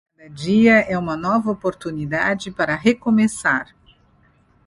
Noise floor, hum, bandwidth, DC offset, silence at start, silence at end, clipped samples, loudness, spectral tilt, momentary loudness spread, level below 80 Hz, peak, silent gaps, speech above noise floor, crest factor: -57 dBFS; none; 11.5 kHz; under 0.1%; 0.25 s; 1.05 s; under 0.1%; -19 LUFS; -5.5 dB/octave; 11 LU; -52 dBFS; -2 dBFS; none; 38 dB; 18 dB